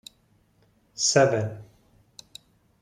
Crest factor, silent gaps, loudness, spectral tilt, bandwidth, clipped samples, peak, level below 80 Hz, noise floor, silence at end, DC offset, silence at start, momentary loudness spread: 24 dB; none; -23 LUFS; -3.5 dB/octave; 14 kHz; under 0.1%; -4 dBFS; -66 dBFS; -64 dBFS; 1.2 s; under 0.1%; 1 s; 26 LU